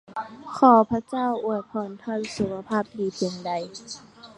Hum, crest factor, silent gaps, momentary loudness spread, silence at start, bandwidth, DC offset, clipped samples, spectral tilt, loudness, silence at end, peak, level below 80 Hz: none; 22 dB; none; 19 LU; 0.1 s; 11 kHz; under 0.1%; under 0.1%; -5.5 dB/octave; -24 LUFS; 0.1 s; -4 dBFS; -60 dBFS